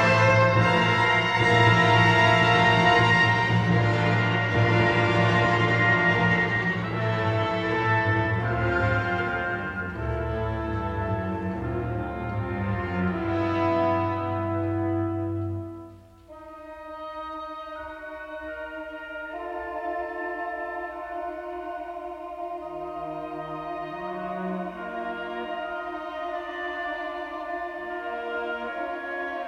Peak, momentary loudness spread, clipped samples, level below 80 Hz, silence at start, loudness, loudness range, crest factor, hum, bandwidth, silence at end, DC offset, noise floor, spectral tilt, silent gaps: -6 dBFS; 17 LU; under 0.1%; -46 dBFS; 0 s; -24 LUFS; 15 LU; 18 dB; none; 9 kHz; 0 s; under 0.1%; -47 dBFS; -6.5 dB/octave; none